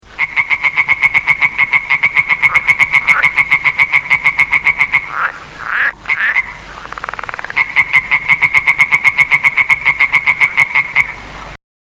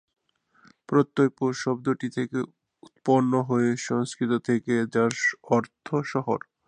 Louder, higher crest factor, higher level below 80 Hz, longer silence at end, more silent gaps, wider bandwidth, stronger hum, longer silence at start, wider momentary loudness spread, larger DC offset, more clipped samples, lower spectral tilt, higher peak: first, -10 LUFS vs -26 LUFS; about the same, 14 dB vs 18 dB; first, -44 dBFS vs -70 dBFS; about the same, 0.25 s vs 0.3 s; neither; first, 18 kHz vs 10 kHz; neither; second, 0.1 s vs 0.9 s; first, 13 LU vs 7 LU; neither; first, 0.2% vs under 0.1%; second, -2 dB/octave vs -6 dB/octave; first, 0 dBFS vs -6 dBFS